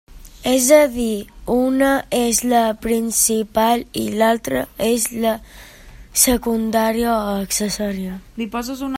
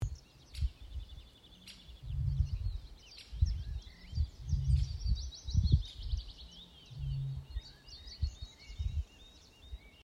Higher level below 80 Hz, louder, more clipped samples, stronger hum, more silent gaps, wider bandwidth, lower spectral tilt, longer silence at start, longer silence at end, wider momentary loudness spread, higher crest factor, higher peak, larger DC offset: about the same, -42 dBFS vs -40 dBFS; first, -18 LUFS vs -38 LUFS; neither; neither; neither; first, 16.5 kHz vs 11 kHz; second, -3 dB/octave vs -6 dB/octave; about the same, 0.1 s vs 0 s; about the same, 0 s vs 0 s; second, 10 LU vs 19 LU; about the same, 18 dB vs 22 dB; first, 0 dBFS vs -14 dBFS; neither